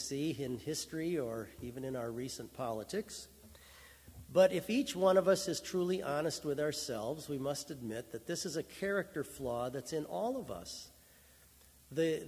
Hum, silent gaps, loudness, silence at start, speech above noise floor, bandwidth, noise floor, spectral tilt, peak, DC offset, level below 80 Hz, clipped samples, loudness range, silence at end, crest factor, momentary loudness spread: none; none; -37 LUFS; 0 s; 26 dB; 16 kHz; -62 dBFS; -4.5 dB/octave; -16 dBFS; under 0.1%; -64 dBFS; under 0.1%; 8 LU; 0 s; 22 dB; 17 LU